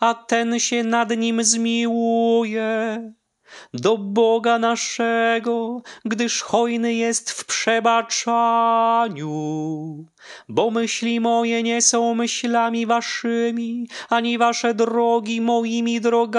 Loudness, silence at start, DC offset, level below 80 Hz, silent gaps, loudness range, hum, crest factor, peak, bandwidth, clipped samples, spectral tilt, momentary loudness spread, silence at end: -20 LUFS; 0 s; under 0.1%; -74 dBFS; none; 2 LU; none; 16 dB; -4 dBFS; 11 kHz; under 0.1%; -3 dB/octave; 9 LU; 0 s